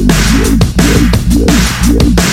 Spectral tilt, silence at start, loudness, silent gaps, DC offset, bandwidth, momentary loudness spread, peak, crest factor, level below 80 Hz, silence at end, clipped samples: -5 dB/octave; 0 s; -9 LUFS; none; 1%; 16.5 kHz; 1 LU; 0 dBFS; 8 dB; -12 dBFS; 0 s; 0.2%